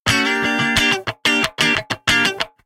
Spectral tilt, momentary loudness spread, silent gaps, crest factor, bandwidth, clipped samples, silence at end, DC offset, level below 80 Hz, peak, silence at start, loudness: -2.5 dB/octave; 3 LU; none; 18 dB; 17 kHz; under 0.1%; 0.2 s; under 0.1%; -44 dBFS; 0 dBFS; 0.05 s; -16 LUFS